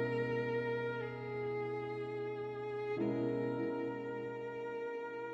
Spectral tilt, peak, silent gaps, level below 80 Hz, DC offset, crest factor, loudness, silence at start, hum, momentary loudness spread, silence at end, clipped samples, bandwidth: -8.5 dB/octave; -24 dBFS; none; -74 dBFS; under 0.1%; 14 dB; -39 LUFS; 0 s; none; 6 LU; 0 s; under 0.1%; 7.6 kHz